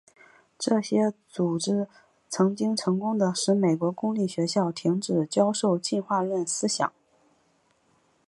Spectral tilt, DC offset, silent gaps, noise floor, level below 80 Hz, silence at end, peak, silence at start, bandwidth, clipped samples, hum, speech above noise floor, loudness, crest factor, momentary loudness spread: -5 dB/octave; under 0.1%; none; -67 dBFS; -74 dBFS; 1.4 s; -8 dBFS; 0.6 s; 11.5 kHz; under 0.1%; none; 41 dB; -26 LUFS; 18 dB; 5 LU